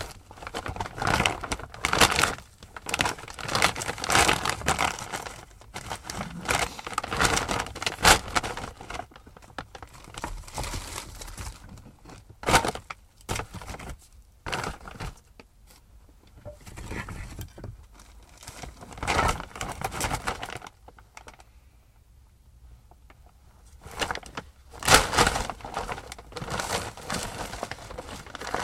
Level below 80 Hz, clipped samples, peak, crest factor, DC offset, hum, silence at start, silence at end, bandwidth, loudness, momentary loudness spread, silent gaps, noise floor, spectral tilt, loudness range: -42 dBFS; under 0.1%; 0 dBFS; 30 dB; under 0.1%; none; 0 s; 0 s; 16 kHz; -27 LUFS; 23 LU; none; -56 dBFS; -2.5 dB/octave; 14 LU